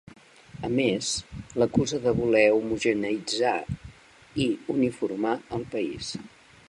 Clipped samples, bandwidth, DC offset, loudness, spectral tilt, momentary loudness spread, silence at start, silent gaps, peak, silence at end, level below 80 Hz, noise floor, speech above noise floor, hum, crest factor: under 0.1%; 11.5 kHz; under 0.1%; -26 LUFS; -4.5 dB/octave; 14 LU; 0.1 s; none; -6 dBFS; 0.4 s; -52 dBFS; -49 dBFS; 23 dB; none; 20 dB